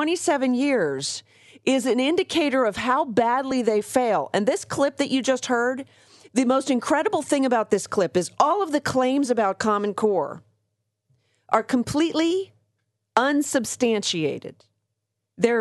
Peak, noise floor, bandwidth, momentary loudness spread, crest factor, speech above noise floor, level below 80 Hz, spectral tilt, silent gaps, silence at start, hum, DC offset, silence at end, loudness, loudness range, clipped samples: -4 dBFS; -80 dBFS; 12 kHz; 6 LU; 18 dB; 57 dB; -62 dBFS; -4 dB/octave; none; 0 s; none; under 0.1%; 0 s; -23 LUFS; 3 LU; under 0.1%